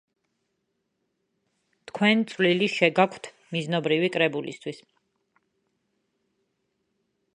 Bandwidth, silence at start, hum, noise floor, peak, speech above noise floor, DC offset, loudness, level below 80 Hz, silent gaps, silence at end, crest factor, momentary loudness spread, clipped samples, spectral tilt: 10.5 kHz; 1.95 s; none; -77 dBFS; -4 dBFS; 53 dB; under 0.1%; -24 LUFS; -78 dBFS; none; 2.6 s; 24 dB; 16 LU; under 0.1%; -5.5 dB/octave